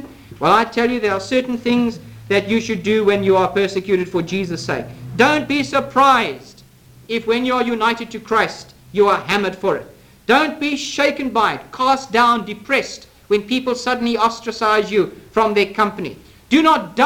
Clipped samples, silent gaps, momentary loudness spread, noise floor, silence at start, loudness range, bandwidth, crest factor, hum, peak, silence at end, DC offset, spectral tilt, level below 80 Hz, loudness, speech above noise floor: under 0.1%; none; 10 LU; -46 dBFS; 0 s; 1 LU; 18 kHz; 16 dB; none; -2 dBFS; 0 s; under 0.1%; -4.5 dB/octave; -52 dBFS; -17 LUFS; 28 dB